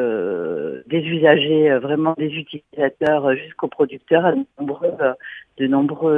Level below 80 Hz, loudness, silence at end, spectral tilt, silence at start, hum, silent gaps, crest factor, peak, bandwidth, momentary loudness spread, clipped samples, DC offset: -66 dBFS; -19 LUFS; 0 s; -8.5 dB/octave; 0 s; none; none; 18 dB; 0 dBFS; 3.8 kHz; 12 LU; under 0.1%; under 0.1%